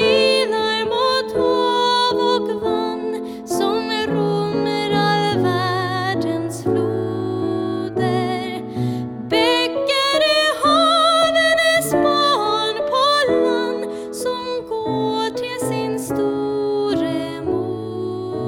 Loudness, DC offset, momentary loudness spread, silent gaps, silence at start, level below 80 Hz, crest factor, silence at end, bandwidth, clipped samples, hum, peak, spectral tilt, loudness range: -19 LUFS; under 0.1%; 10 LU; none; 0 s; -54 dBFS; 12 dB; 0 s; 18 kHz; under 0.1%; none; -6 dBFS; -4.5 dB/octave; 6 LU